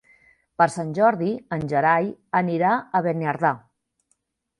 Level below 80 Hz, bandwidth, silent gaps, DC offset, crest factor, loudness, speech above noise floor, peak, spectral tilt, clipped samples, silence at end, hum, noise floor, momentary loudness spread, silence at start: -64 dBFS; 11.5 kHz; none; under 0.1%; 20 dB; -22 LUFS; 50 dB; -4 dBFS; -7 dB/octave; under 0.1%; 1 s; none; -71 dBFS; 7 LU; 0.6 s